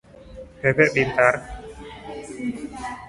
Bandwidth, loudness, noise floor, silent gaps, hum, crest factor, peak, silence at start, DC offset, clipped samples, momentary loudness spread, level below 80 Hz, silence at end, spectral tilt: 11.5 kHz; -21 LUFS; -42 dBFS; none; none; 22 dB; -2 dBFS; 0.15 s; under 0.1%; under 0.1%; 21 LU; -46 dBFS; 0 s; -6 dB/octave